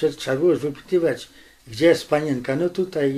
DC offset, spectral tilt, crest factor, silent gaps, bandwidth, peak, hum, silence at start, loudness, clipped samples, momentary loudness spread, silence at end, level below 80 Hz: under 0.1%; -6 dB/octave; 16 dB; none; 14.5 kHz; -6 dBFS; none; 0 s; -22 LUFS; under 0.1%; 9 LU; 0 s; -58 dBFS